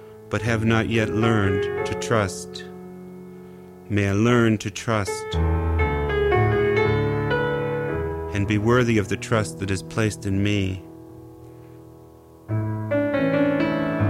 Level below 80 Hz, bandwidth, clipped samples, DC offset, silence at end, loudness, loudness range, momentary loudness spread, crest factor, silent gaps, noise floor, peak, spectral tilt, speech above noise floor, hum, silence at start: -38 dBFS; 13.5 kHz; under 0.1%; under 0.1%; 0 s; -23 LUFS; 5 LU; 20 LU; 16 dB; none; -47 dBFS; -6 dBFS; -6.5 dB/octave; 25 dB; none; 0 s